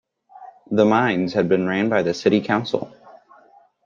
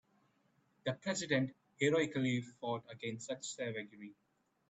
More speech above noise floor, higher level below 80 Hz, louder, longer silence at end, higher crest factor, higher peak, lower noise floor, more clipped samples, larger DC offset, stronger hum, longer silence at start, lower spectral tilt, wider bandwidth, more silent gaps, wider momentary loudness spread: second, 34 dB vs 38 dB; first, -62 dBFS vs -78 dBFS; first, -20 LUFS vs -38 LUFS; about the same, 0.7 s vs 0.6 s; about the same, 18 dB vs 22 dB; first, -2 dBFS vs -18 dBFS; second, -53 dBFS vs -75 dBFS; neither; neither; neither; second, 0.35 s vs 0.85 s; first, -6.5 dB/octave vs -4.5 dB/octave; second, 7.4 kHz vs 9 kHz; neither; second, 9 LU vs 12 LU